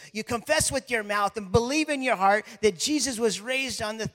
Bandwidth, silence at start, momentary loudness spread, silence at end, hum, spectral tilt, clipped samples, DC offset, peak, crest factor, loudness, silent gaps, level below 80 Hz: 16.5 kHz; 0 s; 5 LU; 0.05 s; none; -3 dB/octave; under 0.1%; under 0.1%; -6 dBFS; 20 dB; -25 LUFS; none; -52 dBFS